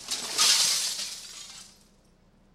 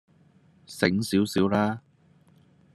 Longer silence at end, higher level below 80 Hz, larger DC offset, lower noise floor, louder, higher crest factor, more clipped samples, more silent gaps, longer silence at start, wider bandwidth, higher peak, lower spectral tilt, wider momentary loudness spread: about the same, 0.9 s vs 0.95 s; about the same, -64 dBFS vs -66 dBFS; neither; about the same, -60 dBFS vs -60 dBFS; about the same, -23 LUFS vs -25 LUFS; about the same, 22 dB vs 22 dB; neither; neither; second, 0 s vs 0.7 s; first, 16 kHz vs 13 kHz; about the same, -8 dBFS vs -6 dBFS; second, 2.5 dB/octave vs -5.5 dB/octave; first, 23 LU vs 12 LU